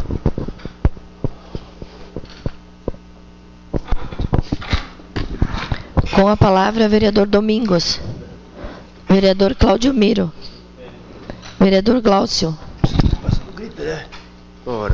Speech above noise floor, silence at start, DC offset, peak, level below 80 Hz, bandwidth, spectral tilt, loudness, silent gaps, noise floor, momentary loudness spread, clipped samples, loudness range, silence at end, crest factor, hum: 28 dB; 0 s; under 0.1%; 0 dBFS; -28 dBFS; 7.6 kHz; -6.5 dB/octave; -17 LUFS; none; -41 dBFS; 21 LU; under 0.1%; 12 LU; 0 s; 18 dB; none